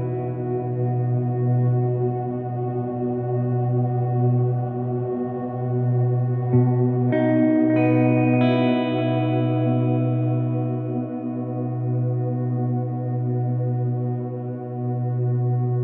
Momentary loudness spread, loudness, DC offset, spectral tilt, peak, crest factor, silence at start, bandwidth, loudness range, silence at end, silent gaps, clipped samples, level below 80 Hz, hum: 8 LU; -22 LUFS; under 0.1%; -9 dB/octave; -8 dBFS; 14 dB; 0 s; 4.2 kHz; 5 LU; 0 s; none; under 0.1%; -66 dBFS; none